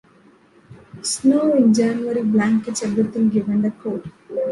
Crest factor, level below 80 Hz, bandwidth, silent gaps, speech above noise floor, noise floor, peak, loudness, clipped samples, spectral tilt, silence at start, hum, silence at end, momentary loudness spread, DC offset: 16 dB; -58 dBFS; 11.5 kHz; none; 34 dB; -52 dBFS; -4 dBFS; -19 LUFS; under 0.1%; -5.5 dB/octave; 0.7 s; none; 0 s; 13 LU; under 0.1%